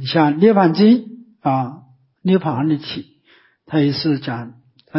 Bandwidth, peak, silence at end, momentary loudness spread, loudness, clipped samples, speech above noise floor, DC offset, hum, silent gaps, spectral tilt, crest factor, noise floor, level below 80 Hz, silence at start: 5.8 kHz; -2 dBFS; 0 s; 17 LU; -17 LUFS; under 0.1%; 39 dB; under 0.1%; none; none; -11 dB/octave; 16 dB; -54 dBFS; -60 dBFS; 0 s